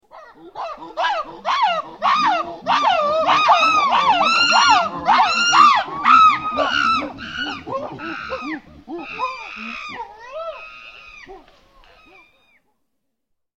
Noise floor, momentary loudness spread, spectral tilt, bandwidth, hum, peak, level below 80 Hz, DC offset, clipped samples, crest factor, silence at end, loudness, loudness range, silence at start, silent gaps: -76 dBFS; 20 LU; -2 dB/octave; 8.8 kHz; none; 0 dBFS; -54 dBFS; under 0.1%; under 0.1%; 18 dB; 2.2 s; -16 LUFS; 18 LU; 0.15 s; none